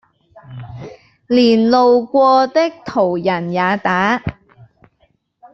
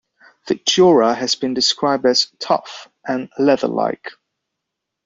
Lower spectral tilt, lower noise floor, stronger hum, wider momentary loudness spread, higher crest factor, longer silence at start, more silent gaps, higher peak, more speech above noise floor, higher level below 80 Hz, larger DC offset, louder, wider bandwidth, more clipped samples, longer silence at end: first, -6.5 dB/octave vs -3.5 dB/octave; second, -60 dBFS vs -80 dBFS; neither; first, 21 LU vs 14 LU; about the same, 14 dB vs 16 dB; about the same, 0.5 s vs 0.45 s; neither; about the same, -2 dBFS vs -2 dBFS; second, 47 dB vs 63 dB; first, -50 dBFS vs -62 dBFS; neither; first, -14 LUFS vs -17 LUFS; second, 6.8 kHz vs 7.8 kHz; neither; first, 1.2 s vs 0.95 s